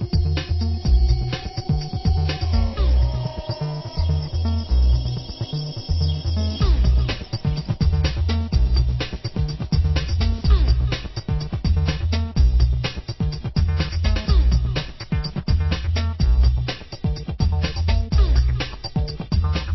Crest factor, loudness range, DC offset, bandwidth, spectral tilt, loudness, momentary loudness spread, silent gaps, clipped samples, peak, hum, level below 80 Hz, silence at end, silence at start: 14 dB; 2 LU; under 0.1%; 6 kHz; -7 dB/octave; -22 LUFS; 8 LU; none; under 0.1%; -6 dBFS; none; -22 dBFS; 0 s; 0 s